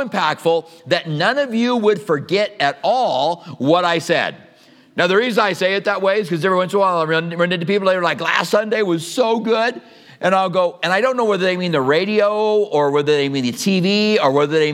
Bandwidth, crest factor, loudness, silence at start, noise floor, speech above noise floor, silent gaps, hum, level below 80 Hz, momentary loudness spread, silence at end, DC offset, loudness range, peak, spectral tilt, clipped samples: 15.5 kHz; 16 dB; -17 LUFS; 0 s; -49 dBFS; 32 dB; none; none; -74 dBFS; 4 LU; 0 s; under 0.1%; 2 LU; 0 dBFS; -5 dB/octave; under 0.1%